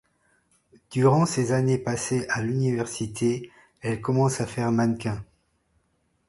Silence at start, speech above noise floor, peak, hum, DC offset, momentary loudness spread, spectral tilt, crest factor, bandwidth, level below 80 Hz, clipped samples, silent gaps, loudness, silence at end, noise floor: 0.9 s; 46 dB; -6 dBFS; none; under 0.1%; 11 LU; -6 dB/octave; 20 dB; 11.5 kHz; -56 dBFS; under 0.1%; none; -25 LUFS; 1.05 s; -70 dBFS